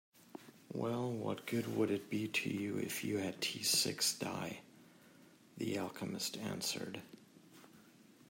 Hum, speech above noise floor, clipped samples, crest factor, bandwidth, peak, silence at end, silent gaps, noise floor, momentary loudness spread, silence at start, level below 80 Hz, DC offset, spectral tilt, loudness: none; 24 dB; under 0.1%; 20 dB; 16 kHz; -20 dBFS; 0.4 s; none; -63 dBFS; 17 LU; 0.25 s; -82 dBFS; under 0.1%; -3 dB/octave; -38 LUFS